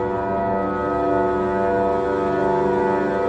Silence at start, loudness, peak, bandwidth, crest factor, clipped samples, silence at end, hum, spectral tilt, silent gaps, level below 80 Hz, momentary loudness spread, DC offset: 0 s; -21 LUFS; -8 dBFS; 8.4 kHz; 12 dB; under 0.1%; 0 s; none; -8 dB/octave; none; -42 dBFS; 3 LU; under 0.1%